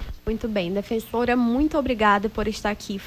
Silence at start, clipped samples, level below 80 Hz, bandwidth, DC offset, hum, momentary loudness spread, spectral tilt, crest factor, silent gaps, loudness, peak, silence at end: 0 s; under 0.1%; -38 dBFS; 16 kHz; under 0.1%; none; 8 LU; -5.5 dB/octave; 16 dB; none; -23 LUFS; -6 dBFS; 0 s